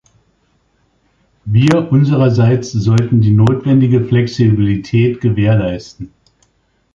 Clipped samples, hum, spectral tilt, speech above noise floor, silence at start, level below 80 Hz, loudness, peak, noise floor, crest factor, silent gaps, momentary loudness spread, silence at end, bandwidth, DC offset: under 0.1%; none; -8 dB/octave; 48 dB; 1.45 s; -40 dBFS; -13 LUFS; 0 dBFS; -60 dBFS; 14 dB; none; 11 LU; 0.9 s; 7.4 kHz; under 0.1%